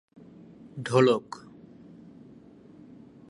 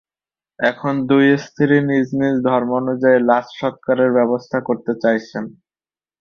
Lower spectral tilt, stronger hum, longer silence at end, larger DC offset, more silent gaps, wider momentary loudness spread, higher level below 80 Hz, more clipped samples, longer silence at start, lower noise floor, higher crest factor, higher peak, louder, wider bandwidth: about the same, -6.5 dB/octave vs -7.5 dB/octave; neither; first, 1.9 s vs 0.7 s; neither; neither; first, 28 LU vs 8 LU; second, -70 dBFS vs -60 dBFS; neither; about the same, 0.65 s vs 0.6 s; second, -52 dBFS vs under -90 dBFS; first, 24 dB vs 16 dB; second, -8 dBFS vs -2 dBFS; second, -25 LUFS vs -17 LUFS; first, 11 kHz vs 6.6 kHz